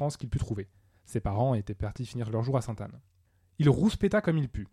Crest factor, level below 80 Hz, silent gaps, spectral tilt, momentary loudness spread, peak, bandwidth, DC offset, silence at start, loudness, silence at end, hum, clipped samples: 18 dB; -46 dBFS; none; -7.5 dB/octave; 13 LU; -12 dBFS; 12 kHz; under 0.1%; 0 s; -30 LUFS; 0.05 s; none; under 0.1%